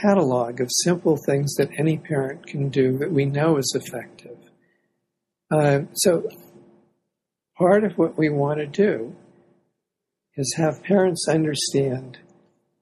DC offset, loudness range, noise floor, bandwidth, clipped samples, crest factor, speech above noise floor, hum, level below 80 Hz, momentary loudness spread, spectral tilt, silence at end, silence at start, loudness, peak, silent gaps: under 0.1%; 3 LU; -83 dBFS; 14 kHz; under 0.1%; 18 dB; 62 dB; none; -64 dBFS; 10 LU; -5 dB/octave; 0.7 s; 0 s; -22 LUFS; -4 dBFS; none